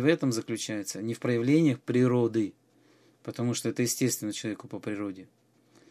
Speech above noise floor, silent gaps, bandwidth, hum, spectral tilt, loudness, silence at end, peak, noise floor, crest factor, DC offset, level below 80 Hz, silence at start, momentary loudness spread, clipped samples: 34 dB; none; 15 kHz; none; -5.5 dB/octave; -29 LUFS; 0.65 s; -8 dBFS; -62 dBFS; 20 dB; under 0.1%; -72 dBFS; 0 s; 13 LU; under 0.1%